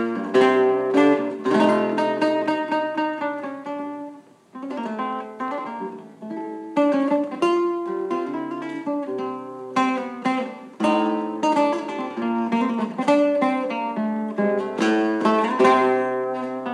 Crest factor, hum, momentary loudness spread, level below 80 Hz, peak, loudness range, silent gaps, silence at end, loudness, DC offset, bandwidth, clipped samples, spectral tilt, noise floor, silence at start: 18 dB; none; 13 LU; under -90 dBFS; -4 dBFS; 7 LU; none; 0 s; -22 LUFS; under 0.1%; 11 kHz; under 0.1%; -6 dB/octave; -43 dBFS; 0 s